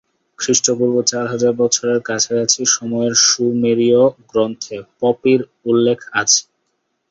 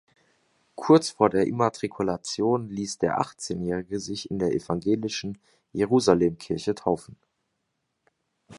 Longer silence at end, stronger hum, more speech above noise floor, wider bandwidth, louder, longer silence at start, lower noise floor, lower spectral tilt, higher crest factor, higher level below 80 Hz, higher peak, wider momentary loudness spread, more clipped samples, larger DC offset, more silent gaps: first, 0.7 s vs 0 s; neither; about the same, 54 dB vs 53 dB; second, 8 kHz vs 11.5 kHz; first, -15 LUFS vs -25 LUFS; second, 0.4 s vs 0.8 s; second, -70 dBFS vs -78 dBFS; second, -2.5 dB/octave vs -5.5 dB/octave; second, 16 dB vs 24 dB; about the same, -60 dBFS vs -56 dBFS; about the same, 0 dBFS vs -2 dBFS; second, 7 LU vs 12 LU; neither; neither; neither